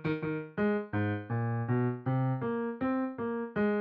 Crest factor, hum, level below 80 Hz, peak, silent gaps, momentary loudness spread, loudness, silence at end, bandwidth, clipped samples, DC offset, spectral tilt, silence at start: 12 dB; none; -64 dBFS; -18 dBFS; none; 4 LU; -32 LUFS; 0 s; 4.8 kHz; under 0.1%; under 0.1%; -8 dB/octave; 0 s